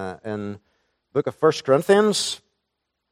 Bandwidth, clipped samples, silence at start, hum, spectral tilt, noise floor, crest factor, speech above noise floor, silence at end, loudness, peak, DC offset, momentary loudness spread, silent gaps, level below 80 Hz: 15.5 kHz; under 0.1%; 0 s; none; -4 dB/octave; -79 dBFS; 18 dB; 58 dB; 0.75 s; -21 LUFS; -4 dBFS; under 0.1%; 17 LU; none; -66 dBFS